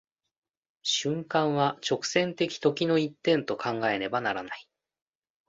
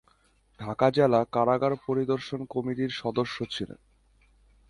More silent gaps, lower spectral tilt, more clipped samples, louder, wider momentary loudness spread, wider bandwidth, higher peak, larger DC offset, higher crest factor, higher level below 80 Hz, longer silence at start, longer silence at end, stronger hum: neither; second, -4 dB/octave vs -7 dB/octave; neither; about the same, -28 LUFS vs -27 LUFS; second, 5 LU vs 12 LU; second, 8 kHz vs 11.5 kHz; about the same, -8 dBFS vs -8 dBFS; neither; about the same, 20 dB vs 20 dB; second, -70 dBFS vs -60 dBFS; first, 0.85 s vs 0.6 s; about the same, 0.85 s vs 0.95 s; neither